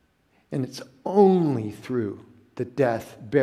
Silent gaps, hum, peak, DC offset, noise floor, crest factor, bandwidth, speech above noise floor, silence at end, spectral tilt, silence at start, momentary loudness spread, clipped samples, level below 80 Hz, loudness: none; none; -4 dBFS; under 0.1%; -65 dBFS; 20 dB; 13.5 kHz; 41 dB; 0 s; -8 dB/octave; 0.5 s; 16 LU; under 0.1%; -66 dBFS; -25 LUFS